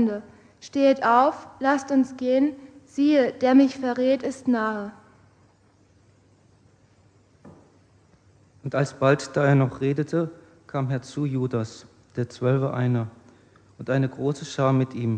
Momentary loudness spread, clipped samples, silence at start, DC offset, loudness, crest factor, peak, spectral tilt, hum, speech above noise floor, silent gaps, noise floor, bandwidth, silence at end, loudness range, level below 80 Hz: 14 LU; under 0.1%; 0 s; under 0.1%; -23 LUFS; 20 dB; -4 dBFS; -7.5 dB/octave; none; 37 dB; none; -59 dBFS; 9.4 kHz; 0 s; 8 LU; -66 dBFS